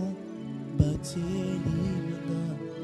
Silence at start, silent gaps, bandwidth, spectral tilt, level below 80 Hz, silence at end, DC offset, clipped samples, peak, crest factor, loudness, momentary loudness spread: 0 s; none; 13 kHz; -7.5 dB/octave; -46 dBFS; 0 s; under 0.1%; under 0.1%; -10 dBFS; 20 dB; -31 LUFS; 9 LU